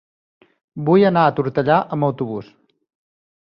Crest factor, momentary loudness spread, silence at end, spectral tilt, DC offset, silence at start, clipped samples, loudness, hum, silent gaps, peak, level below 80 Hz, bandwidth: 18 dB; 13 LU; 1 s; -10 dB/octave; under 0.1%; 0.75 s; under 0.1%; -18 LUFS; none; none; -2 dBFS; -60 dBFS; 5.6 kHz